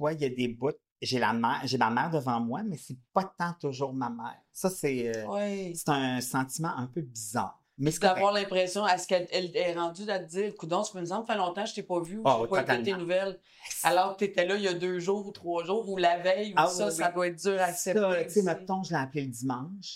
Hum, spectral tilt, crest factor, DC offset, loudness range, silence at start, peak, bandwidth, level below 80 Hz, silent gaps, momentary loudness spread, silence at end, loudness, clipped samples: none; -4.5 dB/octave; 22 dB; under 0.1%; 4 LU; 0 s; -8 dBFS; 16 kHz; -68 dBFS; 0.92-0.96 s; 8 LU; 0 s; -30 LUFS; under 0.1%